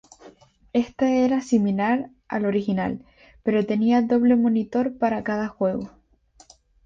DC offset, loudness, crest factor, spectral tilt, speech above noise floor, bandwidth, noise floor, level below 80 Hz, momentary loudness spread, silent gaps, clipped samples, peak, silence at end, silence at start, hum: under 0.1%; -23 LUFS; 16 dB; -7 dB/octave; 35 dB; 7.6 kHz; -56 dBFS; -58 dBFS; 10 LU; none; under 0.1%; -8 dBFS; 1 s; 0.25 s; none